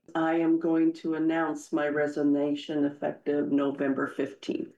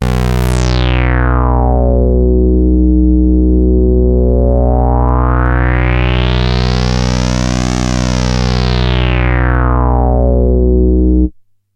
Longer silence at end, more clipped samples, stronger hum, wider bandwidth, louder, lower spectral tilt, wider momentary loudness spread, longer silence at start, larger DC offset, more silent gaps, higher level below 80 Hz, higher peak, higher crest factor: second, 0.1 s vs 0.45 s; neither; neither; about the same, 8.8 kHz vs 8.8 kHz; second, -28 LUFS vs -12 LUFS; about the same, -6.5 dB/octave vs -7 dB/octave; first, 6 LU vs 3 LU; about the same, 0.1 s vs 0 s; neither; neither; second, -80 dBFS vs -12 dBFS; second, -18 dBFS vs 0 dBFS; about the same, 10 dB vs 10 dB